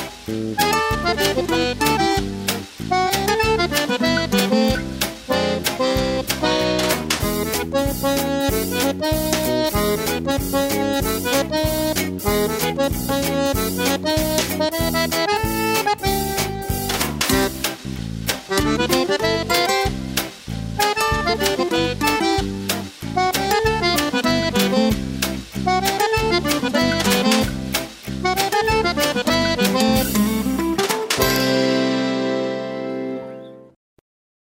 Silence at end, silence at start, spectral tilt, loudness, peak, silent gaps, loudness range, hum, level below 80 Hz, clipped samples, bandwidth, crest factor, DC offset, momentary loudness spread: 0.9 s; 0 s; -4 dB/octave; -20 LUFS; -2 dBFS; none; 2 LU; none; -36 dBFS; under 0.1%; 16.5 kHz; 18 dB; under 0.1%; 7 LU